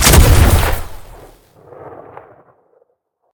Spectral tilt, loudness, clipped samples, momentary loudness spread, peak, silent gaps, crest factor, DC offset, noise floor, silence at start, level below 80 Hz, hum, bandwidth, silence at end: -4 dB/octave; -11 LUFS; 0.3%; 27 LU; 0 dBFS; none; 14 dB; under 0.1%; -65 dBFS; 0 s; -18 dBFS; none; over 20 kHz; 1.45 s